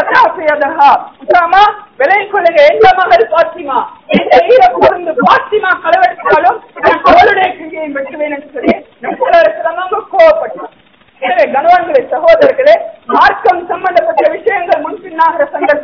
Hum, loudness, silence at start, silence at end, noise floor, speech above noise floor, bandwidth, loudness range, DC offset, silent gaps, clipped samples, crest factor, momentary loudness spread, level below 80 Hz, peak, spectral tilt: none; -9 LUFS; 0 s; 0 s; -45 dBFS; 37 dB; 5.4 kHz; 4 LU; under 0.1%; none; 5%; 10 dB; 10 LU; -44 dBFS; 0 dBFS; -5.5 dB/octave